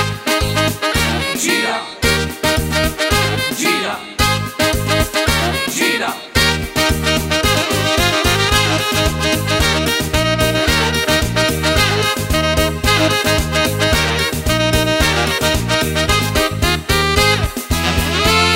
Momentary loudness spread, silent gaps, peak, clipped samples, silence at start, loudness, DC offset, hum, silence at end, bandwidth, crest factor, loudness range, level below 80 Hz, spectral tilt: 4 LU; none; 0 dBFS; under 0.1%; 0 s; -15 LUFS; under 0.1%; none; 0 s; 16.5 kHz; 16 dB; 2 LU; -26 dBFS; -3.5 dB/octave